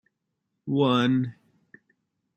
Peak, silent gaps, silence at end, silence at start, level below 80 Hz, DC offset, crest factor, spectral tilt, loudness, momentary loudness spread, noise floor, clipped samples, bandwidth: -10 dBFS; none; 1.05 s; 0.65 s; -72 dBFS; under 0.1%; 18 dB; -7.5 dB/octave; -24 LUFS; 14 LU; -80 dBFS; under 0.1%; 8.4 kHz